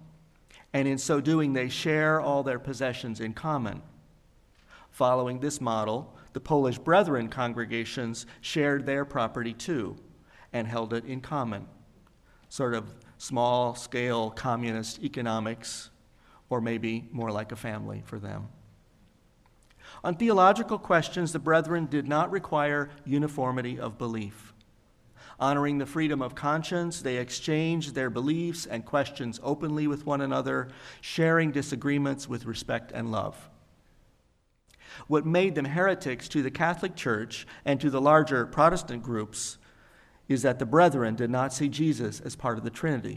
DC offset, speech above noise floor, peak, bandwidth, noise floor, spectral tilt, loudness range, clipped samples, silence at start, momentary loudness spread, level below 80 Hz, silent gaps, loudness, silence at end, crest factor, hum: under 0.1%; 40 dB; -6 dBFS; 14 kHz; -68 dBFS; -5.5 dB/octave; 8 LU; under 0.1%; 0 s; 12 LU; -58 dBFS; none; -28 LUFS; 0 s; 22 dB; none